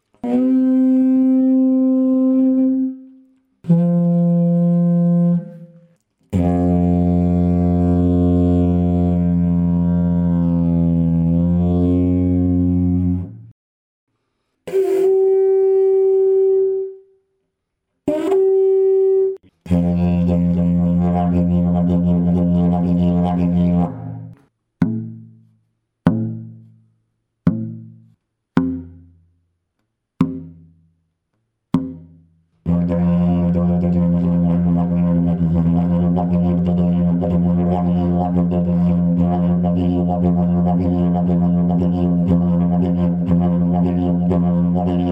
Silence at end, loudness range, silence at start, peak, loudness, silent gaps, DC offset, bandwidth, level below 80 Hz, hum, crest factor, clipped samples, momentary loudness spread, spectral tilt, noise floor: 0 s; 9 LU; 0.25 s; -2 dBFS; -17 LUFS; 13.51-14.07 s; under 0.1%; 3.5 kHz; -38 dBFS; none; 14 dB; under 0.1%; 8 LU; -11.5 dB/octave; -75 dBFS